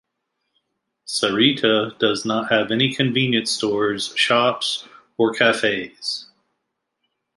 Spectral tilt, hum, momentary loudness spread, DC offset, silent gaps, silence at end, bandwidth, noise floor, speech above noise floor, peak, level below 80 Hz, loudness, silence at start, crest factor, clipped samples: -4 dB/octave; none; 10 LU; under 0.1%; none; 1.15 s; 11.5 kHz; -77 dBFS; 57 dB; -2 dBFS; -64 dBFS; -19 LUFS; 1.05 s; 20 dB; under 0.1%